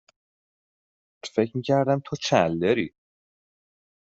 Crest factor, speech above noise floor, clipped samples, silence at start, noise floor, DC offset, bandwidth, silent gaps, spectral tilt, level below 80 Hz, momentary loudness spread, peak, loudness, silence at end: 24 dB; over 67 dB; under 0.1%; 1.25 s; under -90 dBFS; under 0.1%; 8 kHz; none; -5.5 dB/octave; -64 dBFS; 8 LU; -4 dBFS; -24 LUFS; 1.15 s